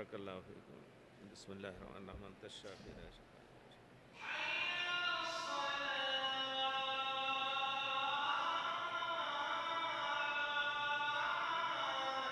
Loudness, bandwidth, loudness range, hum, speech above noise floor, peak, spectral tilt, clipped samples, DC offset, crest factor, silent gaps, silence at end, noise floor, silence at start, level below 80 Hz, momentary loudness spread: -38 LUFS; 12 kHz; 16 LU; none; 14 dB; -24 dBFS; -2 dB/octave; under 0.1%; under 0.1%; 18 dB; none; 0 s; -61 dBFS; 0 s; -70 dBFS; 17 LU